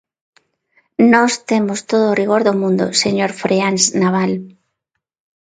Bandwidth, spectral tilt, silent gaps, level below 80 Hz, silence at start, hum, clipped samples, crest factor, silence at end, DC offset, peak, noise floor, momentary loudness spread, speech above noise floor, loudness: 9.6 kHz; -4 dB/octave; none; -60 dBFS; 1 s; none; under 0.1%; 16 dB; 0.9 s; under 0.1%; 0 dBFS; -76 dBFS; 6 LU; 62 dB; -15 LUFS